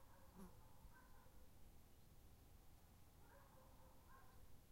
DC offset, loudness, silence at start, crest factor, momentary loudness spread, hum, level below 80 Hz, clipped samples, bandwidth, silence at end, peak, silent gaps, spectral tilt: under 0.1%; -68 LUFS; 0 s; 16 dB; 5 LU; none; -70 dBFS; under 0.1%; 16 kHz; 0 s; -48 dBFS; none; -5 dB/octave